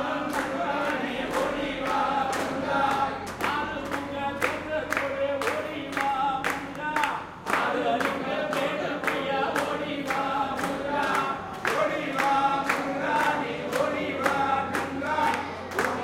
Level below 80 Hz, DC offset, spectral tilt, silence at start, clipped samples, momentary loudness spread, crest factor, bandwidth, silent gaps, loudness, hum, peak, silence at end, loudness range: -58 dBFS; under 0.1%; -4 dB/octave; 0 s; under 0.1%; 5 LU; 20 dB; 17 kHz; none; -27 LUFS; none; -8 dBFS; 0 s; 2 LU